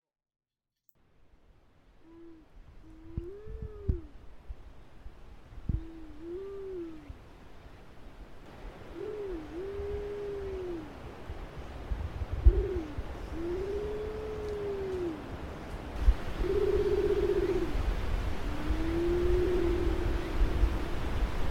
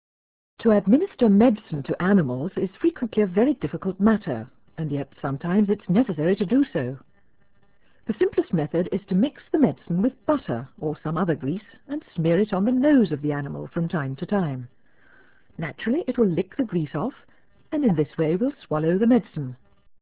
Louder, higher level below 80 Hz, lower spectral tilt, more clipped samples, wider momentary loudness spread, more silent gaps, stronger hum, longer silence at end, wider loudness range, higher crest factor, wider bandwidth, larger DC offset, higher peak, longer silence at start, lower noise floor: second, -34 LUFS vs -23 LUFS; first, -36 dBFS vs -56 dBFS; second, -7.5 dB/octave vs -12 dB/octave; neither; first, 25 LU vs 13 LU; neither; neither; second, 0 s vs 0.45 s; first, 13 LU vs 5 LU; first, 24 dB vs 18 dB; first, 13.5 kHz vs 4 kHz; second, under 0.1% vs 0.1%; about the same, -8 dBFS vs -6 dBFS; first, 2 s vs 0.6 s; first, -72 dBFS vs -64 dBFS